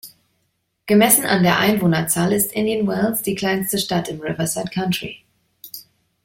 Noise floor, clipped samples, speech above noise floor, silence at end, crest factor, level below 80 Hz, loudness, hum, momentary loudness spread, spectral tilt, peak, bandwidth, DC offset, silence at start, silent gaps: -70 dBFS; under 0.1%; 51 dB; 0.45 s; 20 dB; -54 dBFS; -18 LUFS; none; 20 LU; -4 dB/octave; 0 dBFS; 16.5 kHz; under 0.1%; 0.05 s; none